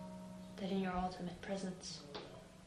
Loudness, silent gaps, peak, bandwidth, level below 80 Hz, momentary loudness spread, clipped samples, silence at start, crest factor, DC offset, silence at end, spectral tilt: -44 LUFS; none; -26 dBFS; 12 kHz; -62 dBFS; 12 LU; under 0.1%; 0 s; 18 dB; under 0.1%; 0 s; -5.5 dB/octave